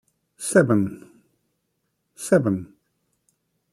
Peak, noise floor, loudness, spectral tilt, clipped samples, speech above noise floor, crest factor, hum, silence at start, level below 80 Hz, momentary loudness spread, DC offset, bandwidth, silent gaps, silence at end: -2 dBFS; -75 dBFS; -21 LUFS; -6 dB/octave; under 0.1%; 55 dB; 22 dB; none; 0.4 s; -66 dBFS; 16 LU; under 0.1%; 14 kHz; none; 1.1 s